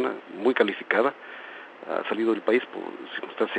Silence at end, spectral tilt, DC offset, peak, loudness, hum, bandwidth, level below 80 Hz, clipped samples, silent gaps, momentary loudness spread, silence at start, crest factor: 0 s; -6 dB/octave; under 0.1%; -4 dBFS; -26 LUFS; none; 8.8 kHz; under -90 dBFS; under 0.1%; none; 17 LU; 0 s; 22 dB